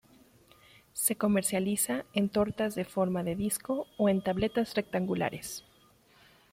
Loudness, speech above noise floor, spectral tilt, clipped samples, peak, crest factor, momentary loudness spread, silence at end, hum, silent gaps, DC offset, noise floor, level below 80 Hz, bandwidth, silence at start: -30 LUFS; 32 dB; -4.5 dB/octave; under 0.1%; -12 dBFS; 20 dB; 6 LU; 0.9 s; none; none; under 0.1%; -63 dBFS; -60 dBFS; 16.5 kHz; 0.95 s